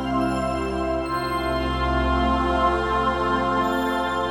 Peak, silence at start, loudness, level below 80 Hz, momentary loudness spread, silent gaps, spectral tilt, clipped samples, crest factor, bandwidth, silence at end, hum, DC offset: -8 dBFS; 0 s; -23 LUFS; -32 dBFS; 4 LU; none; -6 dB/octave; under 0.1%; 14 dB; 17 kHz; 0 s; none; under 0.1%